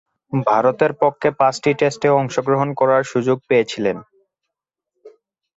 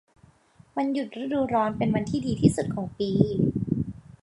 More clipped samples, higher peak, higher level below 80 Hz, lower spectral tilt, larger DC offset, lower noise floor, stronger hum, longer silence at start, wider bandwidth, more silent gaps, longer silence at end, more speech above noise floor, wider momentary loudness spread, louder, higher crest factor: neither; about the same, -2 dBFS vs -4 dBFS; second, -60 dBFS vs -50 dBFS; second, -6 dB/octave vs -7.5 dB/octave; neither; first, -83 dBFS vs -57 dBFS; neither; second, 0.3 s vs 0.75 s; second, 8 kHz vs 11.5 kHz; neither; first, 0.5 s vs 0.25 s; first, 66 dB vs 33 dB; about the same, 6 LU vs 7 LU; first, -18 LUFS vs -26 LUFS; second, 16 dB vs 22 dB